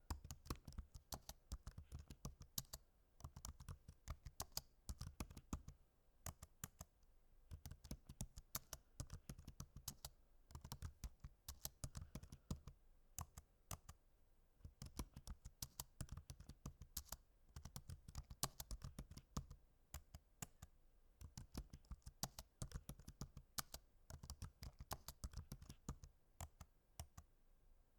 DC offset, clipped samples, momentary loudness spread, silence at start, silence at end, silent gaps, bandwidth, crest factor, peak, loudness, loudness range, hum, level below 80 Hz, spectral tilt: under 0.1%; under 0.1%; 11 LU; 0 s; 0 s; none; 19 kHz; 34 dB; -22 dBFS; -56 LUFS; 4 LU; none; -60 dBFS; -3.5 dB/octave